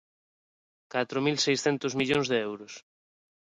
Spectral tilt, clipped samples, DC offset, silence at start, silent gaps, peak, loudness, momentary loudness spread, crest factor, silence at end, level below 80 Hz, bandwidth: -4 dB/octave; under 0.1%; under 0.1%; 0.95 s; none; -12 dBFS; -28 LUFS; 16 LU; 18 dB; 0.7 s; -68 dBFS; 11 kHz